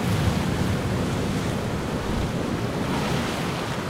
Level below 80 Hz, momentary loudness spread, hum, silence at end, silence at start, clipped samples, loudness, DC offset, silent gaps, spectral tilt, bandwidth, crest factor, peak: -38 dBFS; 3 LU; none; 0 s; 0 s; under 0.1%; -26 LUFS; under 0.1%; none; -5.5 dB/octave; 16 kHz; 14 dB; -10 dBFS